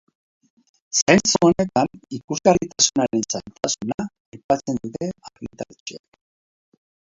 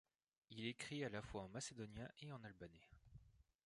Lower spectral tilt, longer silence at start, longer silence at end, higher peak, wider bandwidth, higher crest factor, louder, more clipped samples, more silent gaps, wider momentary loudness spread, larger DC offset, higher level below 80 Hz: about the same, -3.5 dB/octave vs -4.5 dB/octave; first, 0.95 s vs 0.5 s; first, 1.2 s vs 0.25 s; first, 0 dBFS vs -32 dBFS; second, 7.8 kHz vs 11 kHz; about the same, 22 dB vs 22 dB; first, -20 LUFS vs -52 LUFS; neither; first, 1.02-1.06 s, 2.24-2.28 s, 3.94-3.98 s, 4.20-4.32 s, 4.44-4.49 s, 5.80-5.86 s vs none; about the same, 19 LU vs 19 LU; neither; first, -54 dBFS vs -72 dBFS